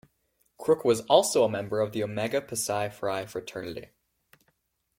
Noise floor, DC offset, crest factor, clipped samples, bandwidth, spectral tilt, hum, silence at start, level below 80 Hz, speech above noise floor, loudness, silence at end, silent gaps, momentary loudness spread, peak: -74 dBFS; under 0.1%; 22 dB; under 0.1%; 16.5 kHz; -4 dB/octave; none; 0.6 s; -66 dBFS; 47 dB; -27 LUFS; 1.15 s; none; 15 LU; -6 dBFS